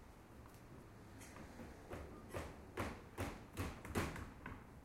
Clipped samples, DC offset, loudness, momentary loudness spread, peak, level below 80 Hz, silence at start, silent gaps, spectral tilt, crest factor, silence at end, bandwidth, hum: under 0.1%; under 0.1%; -50 LUFS; 15 LU; -26 dBFS; -60 dBFS; 0 s; none; -5.5 dB/octave; 24 dB; 0 s; 16.5 kHz; none